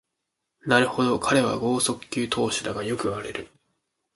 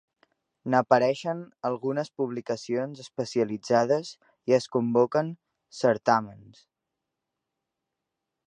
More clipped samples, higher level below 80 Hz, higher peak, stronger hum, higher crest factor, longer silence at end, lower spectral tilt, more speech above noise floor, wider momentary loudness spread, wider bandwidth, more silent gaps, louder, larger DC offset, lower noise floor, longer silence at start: neither; first, -56 dBFS vs -74 dBFS; about the same, -6 dBFS vs -4 dBFS; neither; about the same, 20 dB vs 24 dB; second, 0.7 s vs 2.1 s; second, -4 dB/octave vs -6 dB/octave; about the same, 57 dB vs 59 dB; about the same, 11 LU vs 13 LU; first, 12 kHz vs 10 kHz; neither; first, -24 LUFS vs -27 LUFS; neither; second, -81 dBFS vs -85 dBFS; about the same, 0.65 s vs 0.65 s